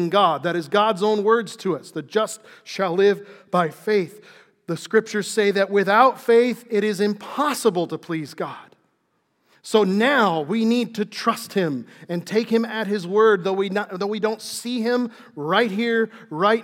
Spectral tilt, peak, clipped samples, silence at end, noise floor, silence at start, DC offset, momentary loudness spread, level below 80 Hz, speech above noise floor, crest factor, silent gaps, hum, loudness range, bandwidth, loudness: -5 dB/octave; -2 dBFS; under 0.1%; 0 s; -69 dBFS; 0 s; under 0.1%; 13 LU; -86 dBFS; 48 dB; 20 dB; none; none; 4 LU; 16.5 kHz; -21 LUFS